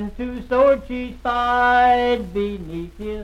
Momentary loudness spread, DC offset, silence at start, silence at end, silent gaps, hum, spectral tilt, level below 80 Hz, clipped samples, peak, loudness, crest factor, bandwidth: 15 LU; under 0.1%; 0 s; 0 s; none; none; -6 dB/octave; -38 dBFS; under 0.1%; -4 dBFS; -19 LUFS; 14 dB; 11 kHz